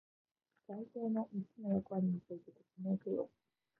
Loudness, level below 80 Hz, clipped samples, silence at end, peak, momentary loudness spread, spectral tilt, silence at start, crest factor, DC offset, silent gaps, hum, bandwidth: -41 LUFS; -78 dBFS; under 0.1%; 0.5 s; -26 dBFS; 12 LU; -12.5 dB/octave; 0.7 s; 16 dB; under 0.1%; none; none; 2.2 kHz